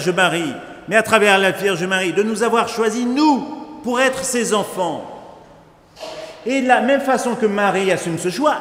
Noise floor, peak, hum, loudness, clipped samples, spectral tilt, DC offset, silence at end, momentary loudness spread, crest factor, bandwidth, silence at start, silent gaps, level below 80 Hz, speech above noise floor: -46 dBFS; 0 dBFS; none; -17 LUFS; under 0.1%; -4 dB/octave; under 0.1%; 0 s; 16 LU; 18 dB; 16 kHz; 0 s; none; -58 dBFS; 29 dB